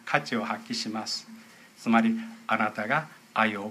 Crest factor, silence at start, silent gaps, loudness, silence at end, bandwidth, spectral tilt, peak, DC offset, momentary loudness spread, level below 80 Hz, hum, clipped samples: 24 dB; 0.05 s; none; -28 LUFS; 0 s; 14 kHz; -4 dB/octave; -6 dBFS; under 0.1%; 10 LU; -78 dBFS; none; under 0.1%